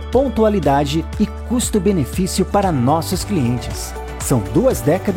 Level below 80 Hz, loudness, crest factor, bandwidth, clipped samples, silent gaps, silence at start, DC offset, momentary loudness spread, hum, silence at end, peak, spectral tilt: -30 dBFS; -18 LUFS; 14 dB; 17 kHz; under 0.1%; none; 0 s; under 0.1%; 6 LU; none; 0 s; -4 dBFS; -6 dB/octave